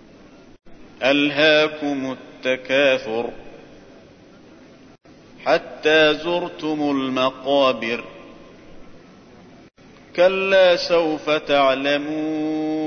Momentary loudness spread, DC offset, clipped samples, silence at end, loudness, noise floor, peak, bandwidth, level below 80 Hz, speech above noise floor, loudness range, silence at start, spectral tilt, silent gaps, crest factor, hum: 12 LU; under 0.1%; under 0.1%; 0 s; -19 LUFS; -47 dBFS; -4 dBFS; 6.6 kHz; -56 dBFS; 28 dB; 5 LU; 0.65 s; -4.5 dB/octave; none; 16 dB; none